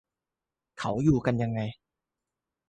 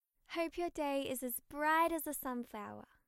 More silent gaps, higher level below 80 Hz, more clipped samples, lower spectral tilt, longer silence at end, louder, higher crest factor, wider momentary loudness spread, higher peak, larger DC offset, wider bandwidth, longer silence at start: neither; first, -54 dBFS vs -66 dBFS; neither; first, -8 dB/octave vs -2.5 dB/octave; first, 0.95 s vs 0.25 s; first, -28 LUFS vs -38 LUFS; about the same, 20 dB vs 16 dB; about the same, 11 LU vs 13 LU; first, -10 dBFS vs -22 dBFS; neither; second, 9.4 kHz vs 16 kHz; first, 0.75 s vs 0.3 s